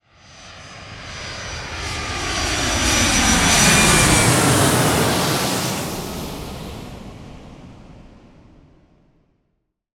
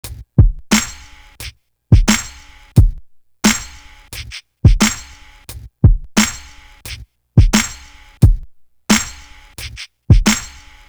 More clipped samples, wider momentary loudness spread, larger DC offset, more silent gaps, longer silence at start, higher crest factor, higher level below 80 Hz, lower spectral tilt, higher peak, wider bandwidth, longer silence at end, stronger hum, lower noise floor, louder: neither; first, 24 LU vs 21 LU; neither; neither; first, 0.35 s vs 0.05 s; about the same, 18 dB vs 16 dB; second, -34 dBFS vs -20 dBFS; second, -3 dB/octave vs -4.5 dB/octave; about the same, -2 dBFS vs 0 dBFS; about the same, 19 kHz vs over 20 kHz; first, 2 s vs 0.45 s; neither; first, -71 dBFS vs -39 dBFS; about the same, -16 LUFS vs -15 LUFS